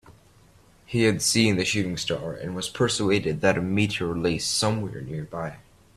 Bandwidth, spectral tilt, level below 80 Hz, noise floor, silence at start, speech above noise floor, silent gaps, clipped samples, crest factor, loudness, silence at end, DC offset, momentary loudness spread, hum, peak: 15 kHz; -4 dB/octave; -52 dBFS; -55 dBFS; 0.1 s; 31 dB; none; under 0.1%; 22 dB; -25 LUFS; 0.35 s; under 0.1%; 12 LU; none; -4 dBFS